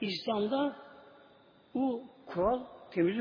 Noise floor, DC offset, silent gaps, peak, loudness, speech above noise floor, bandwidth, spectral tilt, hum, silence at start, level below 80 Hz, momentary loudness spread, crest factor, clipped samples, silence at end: -61 dBFS; under 0.1%; none; -18 dBFS; -34 LUFS; 29 dB; 5.2 kHz; -4.5 dB/octave; none; 0 s; -62 dBFS; 10 LU; 16 dB; under 0.1%; 0 s